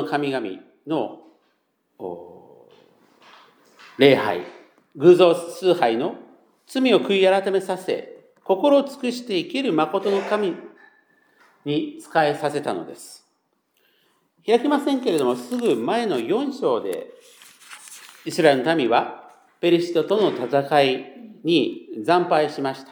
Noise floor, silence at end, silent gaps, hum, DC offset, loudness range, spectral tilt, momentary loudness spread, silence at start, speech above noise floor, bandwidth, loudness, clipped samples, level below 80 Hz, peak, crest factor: -70 dBFS; 0.1 s; none; none; under 0.1%; 8 LU; -5.5 dB/octave; 19 LU; 0 s; 49 dB; 20 kHz; -21 LUFS; under 0.1%; -82 dBFS; -2 dBFS; 20 dB